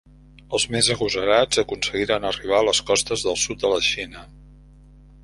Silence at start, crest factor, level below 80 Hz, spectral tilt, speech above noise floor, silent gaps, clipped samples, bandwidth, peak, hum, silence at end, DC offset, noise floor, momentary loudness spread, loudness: 0.5 s; 20 dB; -46 dBFS; -2 dB/octave; 26 dB; none; under 0.1%; 11.5 kHz; -2 dBFS; none; 0.8 s; under 0.1%; -47 dBFS; 5 LU; -21 LUFS